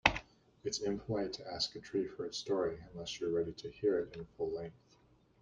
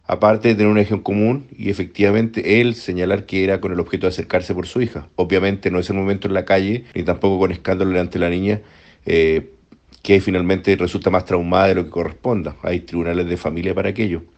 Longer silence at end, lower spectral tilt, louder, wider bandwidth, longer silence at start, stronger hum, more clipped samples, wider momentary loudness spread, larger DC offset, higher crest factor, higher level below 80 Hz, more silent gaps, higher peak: first, 0.7 s vs 0.15 s; second, -4 dB/octave vs -7.5 dB/octave; second, -38 LUFS vs -18 LUFS; first, 9.8 kHz vs 8.4 kHz; about the same, 0.05 s vs 0.1 s; neither; neither; about the same, 10 LU vs 8 LU; neither; first, 30 dB vs 18 dB; second, -60 dBFS vs -44 dBFS; neither; second, -8 dBFS vs 0 dBFS